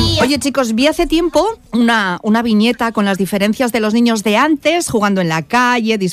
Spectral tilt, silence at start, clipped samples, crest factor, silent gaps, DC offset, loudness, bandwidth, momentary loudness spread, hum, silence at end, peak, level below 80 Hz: -4.5 dB/octave; 0 s; under 0.1%; 12 dB; none; under 0.1%; -14 LUFS; 15.5 kHz; 3 LU; none; 0 s; -2 dBFS; -36 dBFS